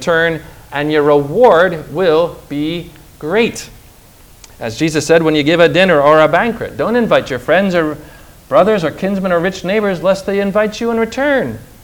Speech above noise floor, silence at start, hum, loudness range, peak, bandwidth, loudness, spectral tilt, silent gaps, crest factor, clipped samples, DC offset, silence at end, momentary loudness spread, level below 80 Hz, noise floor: 29 dB; 0 s; none; 5 LU; 0 dBFS; over 20 kHz; -13 LUFS; -5.5 dB/octave; none; 14 dB; 0.2%; under 0.1%; 0.2 s; 12 LU; -42 dBFS; -42 dBFS